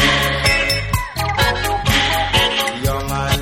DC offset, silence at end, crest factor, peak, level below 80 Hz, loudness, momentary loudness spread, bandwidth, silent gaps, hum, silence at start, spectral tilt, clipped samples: under 0.1%; 0 s; 16 dB; -2 dBFS; -28 dBFS; -16 LUFS; 6 LU; 17 kHz; none; none; 0 s; -3.5 dB/octave; under 0.1%